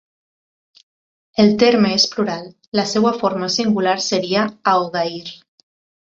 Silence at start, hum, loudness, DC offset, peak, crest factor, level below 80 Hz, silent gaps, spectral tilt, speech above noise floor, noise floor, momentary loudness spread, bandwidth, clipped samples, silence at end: 1.35 s; none; -17 LUFS; under 0.1%; -2 dBFS; 18 dB; -60 dBFS; 2.68-2.72 s; -4.5 dB/octave; over 73 dB; under -90 dBFS; 11 LU; 7.8 kHz; under 0.1%; 0.7 s